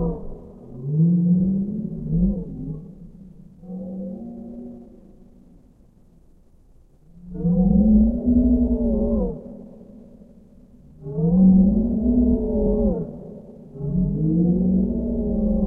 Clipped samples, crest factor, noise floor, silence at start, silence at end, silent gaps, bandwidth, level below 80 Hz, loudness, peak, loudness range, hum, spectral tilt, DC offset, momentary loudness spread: under 0.1%; 16 dB; -52 dBFS; 0 s; 0 s; none; 1.3 kHz; -32 dBFS; -20 LUFS; -6 dBFS; 18 LU; none; -15 dB/octave; under 0.1%; 22 LU